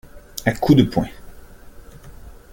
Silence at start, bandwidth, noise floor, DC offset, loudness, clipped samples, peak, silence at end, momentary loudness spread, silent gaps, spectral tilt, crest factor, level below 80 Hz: 0.15 s; 17 kHz; -40 dBFS; under 0.1%; -19 LUFS; under 0.1%; -2 dBFS; 0.25 s; 16 LU; none; -6.5 dB/octave; 20 dB; -40 dBFS